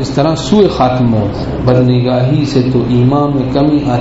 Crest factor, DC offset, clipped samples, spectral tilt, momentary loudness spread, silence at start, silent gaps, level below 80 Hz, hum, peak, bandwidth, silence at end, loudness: 10 dB; under 0.1%; under 0.1%; -7.5 dB/octave; 3 LU; 0 s; none; -30 dBFS; none; 0 dBFS; 8 kHz; 0 s; -11 LUFS